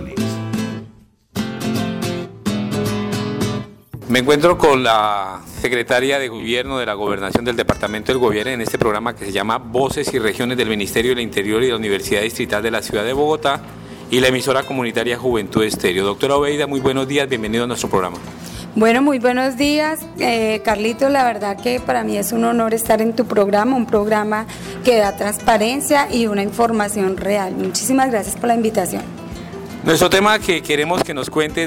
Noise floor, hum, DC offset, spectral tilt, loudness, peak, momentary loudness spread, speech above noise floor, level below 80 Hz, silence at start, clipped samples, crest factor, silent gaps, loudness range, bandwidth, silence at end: -46 dBFS; none; under 0.1%; -4.5 dB/octave; -18 LUFS; -4 dBFS; 9 LU; 28 dB; -44 dBFS; 0 s; under 0.1%; 14 dB; none; 3 LU; 18 kHz; 0 s